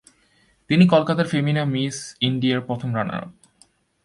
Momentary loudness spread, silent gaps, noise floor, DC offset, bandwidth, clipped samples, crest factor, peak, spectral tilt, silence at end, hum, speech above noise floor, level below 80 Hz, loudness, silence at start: 12 LU; none; -61 dBFS; under 0.1%; 11.5 kHz; under 0.1%; 20 dB; -2 dBFS; -6 dB/octave; 0.75 s; none; 40 dB; -60 dBFS; -21 LUFS; 0.7 s